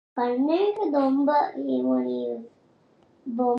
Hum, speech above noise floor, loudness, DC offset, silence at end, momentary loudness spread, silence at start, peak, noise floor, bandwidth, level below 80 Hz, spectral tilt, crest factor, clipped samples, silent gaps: none; 36 dB; -25 LUFS; under 0.1%; 0 s; 12 LU; 0.15 s; -12 dBFS; -60 dBFS; 5.6 kHz; -80 dBFS; -7.5 dB/octave; 14 dB; under 0.1%; none